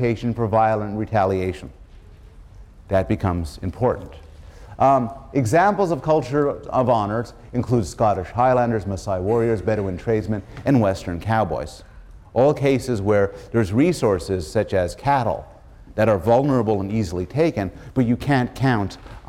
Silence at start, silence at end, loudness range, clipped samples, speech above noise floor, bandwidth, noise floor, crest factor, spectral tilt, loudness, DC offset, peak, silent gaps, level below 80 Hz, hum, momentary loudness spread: 0 s; 0 s; 3 LU; under 0.1%; 23 dB; 15 kHz; -44 dBFS; 16 dB; -7.5 dB/octave; -21 LUFS; under 0.1%; -6 dBFS; none; -42 dBFS; none; 9 LU